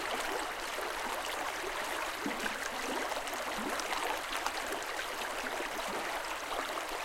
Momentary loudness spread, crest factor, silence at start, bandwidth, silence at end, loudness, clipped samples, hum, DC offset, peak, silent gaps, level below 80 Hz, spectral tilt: 2 LU; 20 dB; 0 s; 17 kHz; 0 s; -36 LUFS; under 0.1%; none; under 0.1%; -16 dBFS; none; -58 dBFS; -1 dB/octave